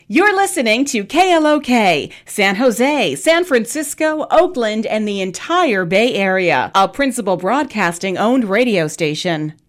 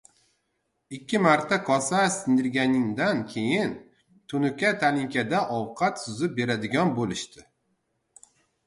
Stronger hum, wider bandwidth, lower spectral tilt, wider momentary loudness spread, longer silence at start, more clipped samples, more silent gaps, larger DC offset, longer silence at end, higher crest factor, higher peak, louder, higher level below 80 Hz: neither; first, 16 kHz vs 11.5 kHz; about the same, -4 dB/octave vs -5 dB/octave; second, 5 LU vs 9 LU; second, 0.1 s vs 0.9 s; neither; neither; neither; second, 0.15 s vs 1.25 s; second, 12 dB vs 20 dB; about the same, -4 dBFS vs -6 dBFS; first, -15 LUFS vs -25 LUFS; first, -54 dBFS vs -64 dBFS